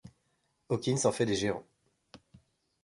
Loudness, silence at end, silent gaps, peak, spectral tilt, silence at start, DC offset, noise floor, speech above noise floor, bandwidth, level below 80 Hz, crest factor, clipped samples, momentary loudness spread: -31 LUFS; 1.2 s; none; -14 dBFS; -4.5 dB/octave; 0.05 s; under 0.1%; -76 dBFS; 46 dB; 11.5 kHz; -64 dBFS; 22 dB; under 0.1%; 7 LU